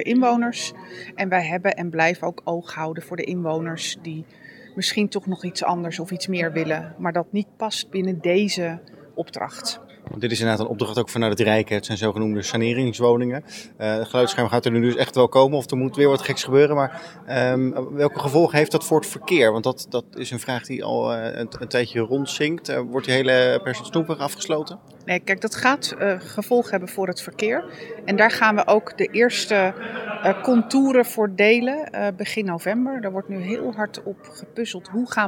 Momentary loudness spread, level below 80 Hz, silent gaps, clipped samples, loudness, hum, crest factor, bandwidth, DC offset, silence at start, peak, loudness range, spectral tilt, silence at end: 12 LU; -68 dBFS; none; under 0.1%; -22 LUFS; none; 20 dB; 18 kHz; under 0.1%; 0 s; -2 dBFS; 6 LU; -5 dB/octave; 0 s